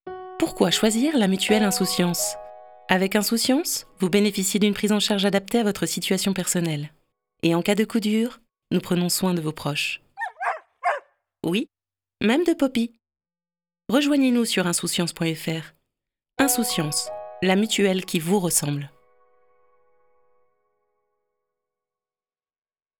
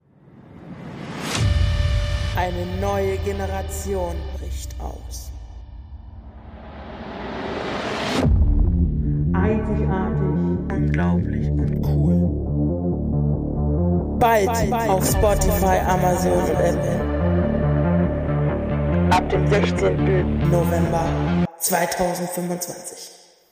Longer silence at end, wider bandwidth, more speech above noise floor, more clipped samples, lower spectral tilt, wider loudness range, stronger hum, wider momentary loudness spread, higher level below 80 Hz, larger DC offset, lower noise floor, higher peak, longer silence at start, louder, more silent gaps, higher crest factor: first, 4.1 s vs 0.4 s; first, over 20 kHz vs 15.5 kHz; first, over 68 dB vs 28 dB; neither; second, -4 dB/octave vs -6 dB/octave; second, 5 LU vs 10 LU; neither; second, 11 LU vs 16 LU; second, -58 dBFS vs -28 dBFS; neither; first, under -90 dBFS vs -48 dBFS; first, 0 dBFS vs -6 dBFS; second, 0.05 s vs 0.35 s; about the same, -23 LUFS vs -21 LUFS; neither; first, 24 dB vs 14 dB